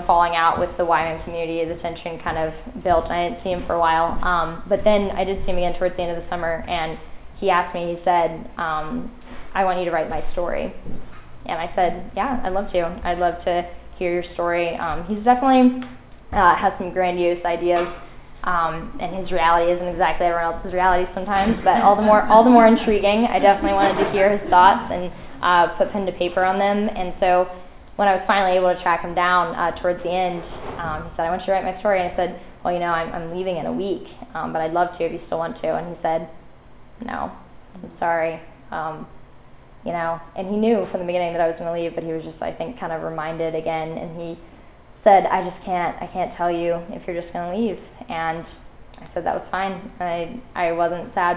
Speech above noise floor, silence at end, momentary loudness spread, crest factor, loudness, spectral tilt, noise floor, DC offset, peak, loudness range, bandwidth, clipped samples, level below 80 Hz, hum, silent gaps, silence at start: 25 dB; 0 s; 14 LU; 20 dB; -21 LUFS; -9.5 dB/octave; -45 dBFS; under 0.1%; 0 dBFS; 10 LU; 4 kHz; under 0.1%; -40 dBFS; none; none; 0 s